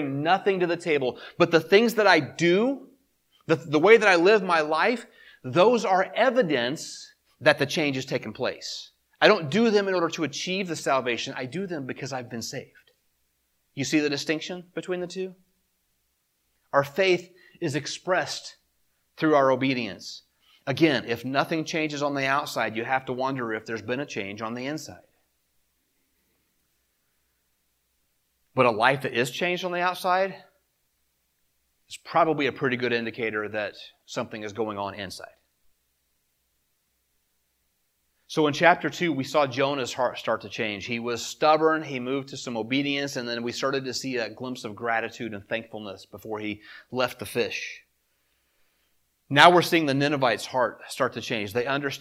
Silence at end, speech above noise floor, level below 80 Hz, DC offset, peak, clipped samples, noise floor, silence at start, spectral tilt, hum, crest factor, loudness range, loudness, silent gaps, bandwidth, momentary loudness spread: 0 s; 48 dB; -72 dBFS; under 0.1%; 0 dBFS; under 0.1%; -73 dBFS; 0 s; -4.5 dB/octave; none; 26 dB; 11 LU; -25 LUFS; none; 16.5 kHz; 15 LU